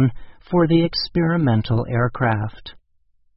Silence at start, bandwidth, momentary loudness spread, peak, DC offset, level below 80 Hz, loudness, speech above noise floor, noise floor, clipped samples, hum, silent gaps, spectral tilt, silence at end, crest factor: 0 s; 5.8 kHz; 7 LU; -4 dBFS; under 0.1%; -44 dBFS; -20 LUFS; 41 dB; -60 dBFS; under 0.1%; none; none; -10.5 dB/octave; 0.6 s; 16 dB